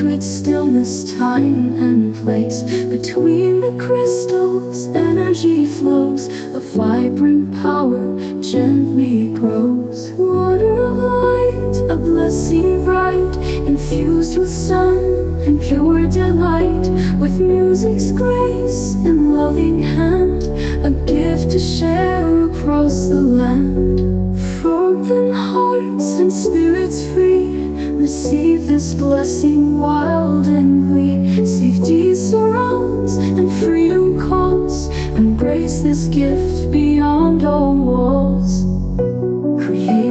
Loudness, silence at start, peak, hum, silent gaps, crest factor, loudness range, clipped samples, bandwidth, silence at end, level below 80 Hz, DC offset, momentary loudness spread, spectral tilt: -16 LUFS; 0 s; -2 dBFS; none; none; 12 dB; 2 LU; under 0.1%; 8.8 kHz; 0 s; -28 dBFS; under 0.1%; 5 LU; -7 dB/octave